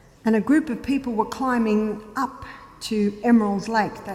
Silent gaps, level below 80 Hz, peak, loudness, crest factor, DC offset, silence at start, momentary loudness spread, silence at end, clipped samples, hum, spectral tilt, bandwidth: none; -52 dBFS; -8 dBFS; -23 LUFS; 16 dB; under 0.1%; 0.25 s; 10 LU; 0 s; under 0.1%; none; -6 dB/octave; 14 kHz